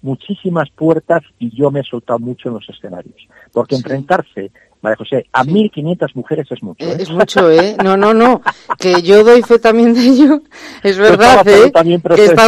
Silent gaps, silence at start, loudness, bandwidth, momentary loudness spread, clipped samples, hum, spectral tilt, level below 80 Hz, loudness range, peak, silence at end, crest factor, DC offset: none; 0.05 s; -11 LUFS; 13.5 kHz; 17 LU; 0.6%; none; -5.5 dB/octave; -48 dBFS; 11 LU; 0 dBFS; 0 s; 10 dB; under 0.1%